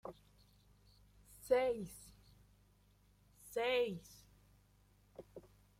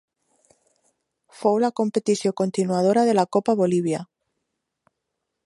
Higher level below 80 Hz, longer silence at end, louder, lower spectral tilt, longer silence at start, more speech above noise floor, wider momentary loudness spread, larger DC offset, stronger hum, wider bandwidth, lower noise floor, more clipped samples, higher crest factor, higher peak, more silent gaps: about the same, -70 dBFS vs -72 dBFS; second, 0.4 s vs 1.4 s; second, -38 LUFS vs -22 LUFS; second, -4 dB/octave vs -6 dB/octave; second, 0.05 s vs 1.4 s; second, 32 dB vs 59 dB; first, 26 LU vs 5 LU; neither; first, 50 Hz at -65 dBFS vs none; first, 16 kHz vs 11.5 kHz; second, -70 dBFS vs -80 dBFS; neither; about the same, 22 dB vs 18 dB; second, -20 dBFS vs -6 dBFS; neither